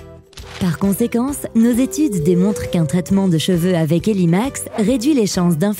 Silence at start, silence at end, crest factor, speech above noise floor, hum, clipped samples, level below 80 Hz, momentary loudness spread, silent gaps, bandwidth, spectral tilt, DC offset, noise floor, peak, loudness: 0 s; 0 s; 12 dB; 21 dB; none; under 0.1%; -42 dBFS; 4 LU; none; 16.5 kHz; -6 dB/octave; under 0.1%; -37 dBFS; -4 dBFS; -17 LUFS